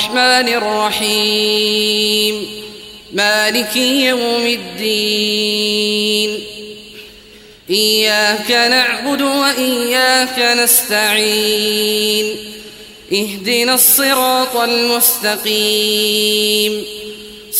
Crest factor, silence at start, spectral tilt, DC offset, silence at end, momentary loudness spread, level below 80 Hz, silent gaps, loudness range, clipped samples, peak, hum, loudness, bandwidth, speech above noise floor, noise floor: 16 dB; 0 s; -1 dB/octave; under 0.1%; 0 s; 14 LU; -54 dBFS; none; 3 LU; under 0.1%; 0 dBFS; none; -13 LUFS; 16 kHz; 26 dB; -40 dBFS